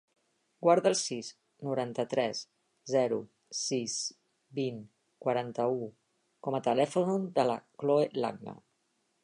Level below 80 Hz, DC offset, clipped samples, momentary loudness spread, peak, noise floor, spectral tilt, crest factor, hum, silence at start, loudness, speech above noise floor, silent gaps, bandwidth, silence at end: -82 dBFS; under 0.1%; under 0.1%; 14 LU; -12 dBFS; -76 dBFS; -4.5 dB/octave; 20 dB; none; 0.6 s; -31 LUFS; 46 dB; none; 11 kHz; 0.7 s